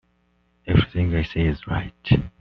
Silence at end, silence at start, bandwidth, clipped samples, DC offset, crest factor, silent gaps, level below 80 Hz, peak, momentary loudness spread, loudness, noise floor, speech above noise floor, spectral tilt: 0.1 s; 0.65 s; 5.8 kHz; under 0.1%; under 0.1%; 18 dB; none; -36 dBFS; -4 dBFS; 8 LU; -23 LUFS; -65 dBFS; 43 dB; -6.5 dB/octave